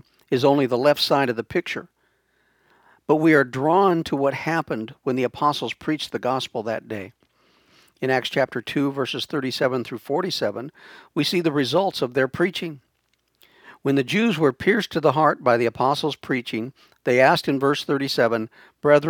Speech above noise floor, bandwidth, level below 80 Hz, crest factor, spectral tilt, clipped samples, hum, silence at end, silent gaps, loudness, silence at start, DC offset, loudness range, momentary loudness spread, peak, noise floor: 48 dB; 19.5 kHz; -62 dBFS; 20 dB; -5.5 dB/octave; under 0.1%; none; 0 s; none; -22 LUFS; 0.3 s; under 0.1%; 5 LU; 12 LU; -2 dBFS; -70 dBFS